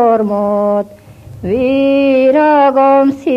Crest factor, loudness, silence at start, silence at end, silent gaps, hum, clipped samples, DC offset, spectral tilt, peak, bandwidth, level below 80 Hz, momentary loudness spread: 10 dB; -11 LUFS; 0 s; 0 s; none; none; under 0.1%; under 0.1%; -7.5 dB/octave; 0 dBFS; 7 kHz; -46 dBFS; 9 LU